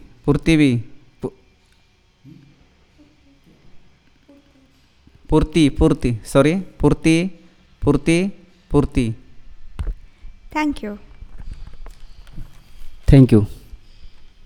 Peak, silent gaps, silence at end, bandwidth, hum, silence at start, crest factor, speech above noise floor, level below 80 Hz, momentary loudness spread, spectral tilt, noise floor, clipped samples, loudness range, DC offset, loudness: 0 dBFS; none; 0.2 s; 12 kHz; none; 0.25 s; 20 dB; 40 dB; -32 dBFS; 18 LU; -7 dB/octave; -56 dBFS; under 0.1%; 12 LU; under 0.1%; -18 LUFS